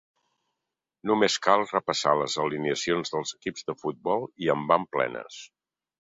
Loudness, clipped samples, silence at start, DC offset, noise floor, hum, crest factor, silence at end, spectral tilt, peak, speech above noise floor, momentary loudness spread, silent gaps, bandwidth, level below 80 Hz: -26 LUFS; under 0.1%; 1.05 s; under 0.1%; -86 dBFS; none; 22 dB; 0.7 s; -3.5 dB/octave; -4 dBFS; 60 dB; 11 LU; none; 8 kHz; -68 dBFS